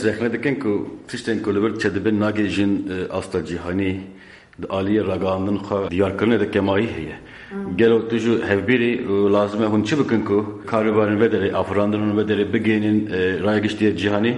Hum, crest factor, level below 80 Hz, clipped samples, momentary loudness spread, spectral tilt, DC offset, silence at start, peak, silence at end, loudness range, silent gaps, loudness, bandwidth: none; 16 dB; -52 dBFS; under 0.1%; 8 LU; -7 dB/octave; under 0.1%; 0 s; -4 dBFS; 0 s; 4 LU; none; -20 LUFS; 11 kHz